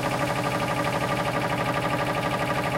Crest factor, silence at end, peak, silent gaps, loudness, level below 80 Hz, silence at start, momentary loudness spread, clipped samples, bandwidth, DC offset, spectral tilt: 14 dB; 0 s; -12 dBFS; none; -25 LUFS; -48 dBFS; 0 s; 0 LU; under 0.1%; 16.5 kHz; under 0.1%; -5 dB/octave